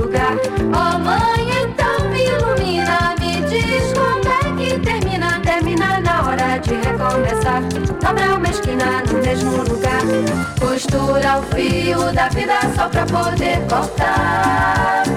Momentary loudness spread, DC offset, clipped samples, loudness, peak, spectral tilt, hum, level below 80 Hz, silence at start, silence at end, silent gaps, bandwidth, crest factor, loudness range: 3 LU; under 0.1%; under 0.1%; -17 LUFS; -8 dBFS; -5.5 dB/octave; none; -30 dBFS; 0 s; 0 s; none; 17 kHz; 10 dB; 1 LU